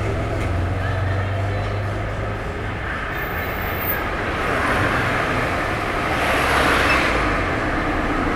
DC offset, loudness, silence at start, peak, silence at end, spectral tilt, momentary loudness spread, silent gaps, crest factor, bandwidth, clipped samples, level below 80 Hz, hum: under 0.1%; -21 LUFS; 0 s; -4 dBFS; 0 s; -5.5 dB/octave; 9 LU; none; 16 dB; 16 kHz; under 0.1%; -30 dBFS; none